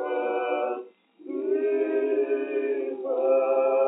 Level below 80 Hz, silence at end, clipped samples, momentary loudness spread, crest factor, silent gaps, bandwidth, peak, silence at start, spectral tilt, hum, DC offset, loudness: under -90 dBFS; 0 s; under 0.1%; 8 LU; 14 dB; none; 3.9 kHz; -12 dBFS; 0 s; -1.5 dB/octave; none; under 0.1%; -26 LUFS